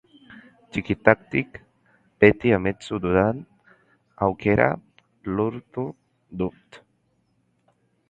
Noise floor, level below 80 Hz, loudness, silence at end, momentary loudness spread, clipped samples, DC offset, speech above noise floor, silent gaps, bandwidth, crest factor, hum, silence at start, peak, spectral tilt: -68 dBFS; -48 dBFS; -23 LUFS; 1.35 s; 16 LU; under 0.1%; under 0.1%; 46 dB; none; 8.8 kHz; 24 dB; none; 0.3 s; 0 dBFS; -8 dB/octave